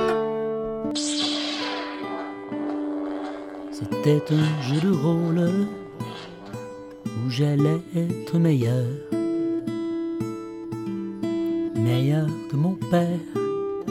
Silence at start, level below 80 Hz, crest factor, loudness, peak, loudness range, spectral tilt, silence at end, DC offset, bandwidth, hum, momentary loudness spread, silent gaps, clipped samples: 0 s; -60 dBFS; 16 dB; -25 LUFS; -8 dBFS; 3 LU; -6.5 dB/octave; 0 s; under 0.1%; 14.5 kHz; none; 13 LU; none; under 0.1%